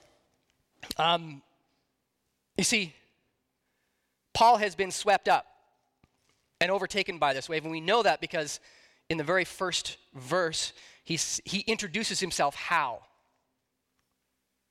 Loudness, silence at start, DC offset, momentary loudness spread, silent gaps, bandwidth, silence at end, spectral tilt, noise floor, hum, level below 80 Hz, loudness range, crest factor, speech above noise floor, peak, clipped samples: -28 LUFS; 0.8 s; under 0.1%; 11 LU; none; 16 kHz; 1.7 s; -2.5 dB/octave; -80 dBFS; none; -64 dBFS; 4 LU; 18 dB; 51 dB; -12 dBFS; under 0.1%